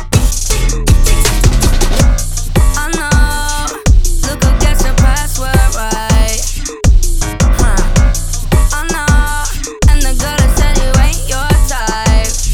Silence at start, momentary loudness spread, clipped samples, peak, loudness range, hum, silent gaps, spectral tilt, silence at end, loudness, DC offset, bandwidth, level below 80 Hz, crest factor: 0 s; 5 LU; 0.6%; 0 dBFS; 1 LU; none; none; -4 dB/octave; 0 s; -13 LUFS; under 0.1%; 17 kHz; -12 dBFS; 10 dB